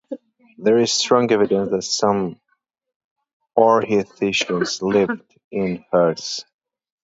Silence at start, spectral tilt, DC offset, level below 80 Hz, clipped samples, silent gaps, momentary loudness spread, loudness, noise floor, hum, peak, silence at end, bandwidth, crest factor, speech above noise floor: 0.1 s; -4 dB/octave; under 0.1%; -60 dBFS; under 0.1%; 2.96-3.16 s, 3.33-3.40 s, 5.44-5.51 s; 13 LU; -19 LUFS; -42 dBFS; none; 0 dBFS; 0.6 s; 8 kHz; 20 dB; 24 dB